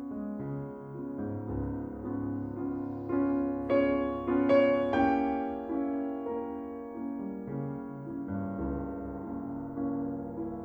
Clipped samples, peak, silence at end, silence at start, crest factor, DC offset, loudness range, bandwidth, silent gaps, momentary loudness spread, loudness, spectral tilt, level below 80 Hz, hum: under 0.1%; -14 dBFS; 0 s; 0 s; 18 dB; under 0.1%; 8 LU; 5.2 kHz; none; 12 LU; -33 LUFS; -9.5 dB/octave; -52 dBFS; none